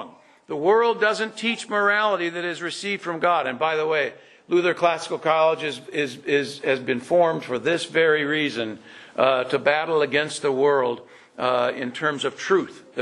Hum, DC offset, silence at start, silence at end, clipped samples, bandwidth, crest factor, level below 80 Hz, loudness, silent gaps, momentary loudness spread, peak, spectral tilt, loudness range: none; under 0.1%; 0 s; 0 s; under 0.1%; 11.5 kHz; 20 dB; -74 dBFS; -22 LUFS; none; 8 LU; -2 dBFS; -4 dB/octave; 1 LU